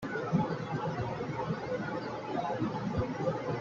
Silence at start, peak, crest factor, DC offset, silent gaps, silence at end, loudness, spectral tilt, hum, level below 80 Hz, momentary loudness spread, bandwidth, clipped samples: 0 s; -16 dBFS; 18 dB; under 0.1%; none; 0 s; -35 LUFS; -7.5 dB/octave; none; -58 dBFS; 4 LU; 7.6 kHz; under 0.1%